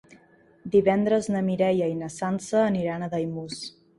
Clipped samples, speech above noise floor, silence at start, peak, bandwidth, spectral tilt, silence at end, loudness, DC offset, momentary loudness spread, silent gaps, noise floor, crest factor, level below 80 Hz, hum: under 0.1%; 33 dB; 0.65 s; -8 dBFS; 11.5 kHz; -6.5 dB/octave; 0.3 s; -25 LUFS; under 0.1%; 12 LU; none; -57 dBFS; 18 dB; -62 dBFS; none